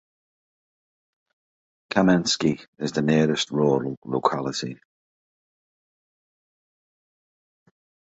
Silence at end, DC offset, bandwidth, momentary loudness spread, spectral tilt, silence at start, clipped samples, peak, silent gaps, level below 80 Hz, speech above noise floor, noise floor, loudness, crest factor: 3.45 s; under 0.1%; 8.2 kHz; 9 LU; -5 dB/octave; 1.9 s; under 0.1%; -4 dBFS; 2.68-2.73 s, 3.97-4.02 s; -62 dBFS; over 67 dB; under -90 dBFS; -23 LUFS; 22 dB